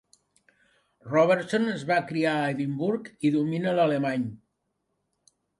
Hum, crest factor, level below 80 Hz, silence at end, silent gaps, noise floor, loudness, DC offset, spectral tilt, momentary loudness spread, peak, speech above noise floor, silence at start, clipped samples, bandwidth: none; 18 dB; -70 dBFS; 1.25 s; none; -78 dBFS; -26 LUFS; under 0.1%; -7 dB/octave; 6 LU; -10 dBFS; 53 dB; 1.05 s; under 0.1%; 11.5 kHz